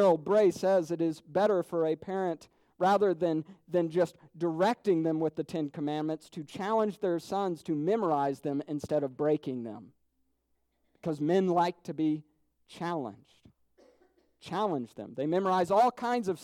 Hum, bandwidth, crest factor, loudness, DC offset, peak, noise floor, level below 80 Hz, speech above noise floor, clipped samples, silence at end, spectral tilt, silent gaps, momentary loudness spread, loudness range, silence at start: none; 15 kHz; 16 dB; -30 LUFS; under 0.1%; -14 dBFS; -76 dBFS; -74 dBFS; 47 dB; under 0.1%; 0 s; -7 dB/octave; none; 11 LU; 5 LU; 0 s